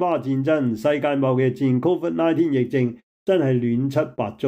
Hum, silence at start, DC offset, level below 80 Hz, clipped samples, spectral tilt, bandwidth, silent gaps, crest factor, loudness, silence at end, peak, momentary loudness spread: none; 0 s; under 0.1%; -64 dBFS; under 0.1%; -8.5 dB/octave; 15 kHz; 3.03-3.26 s; 12 dB; -21 LUFS; 0 s; -8 dBFS; 4 LU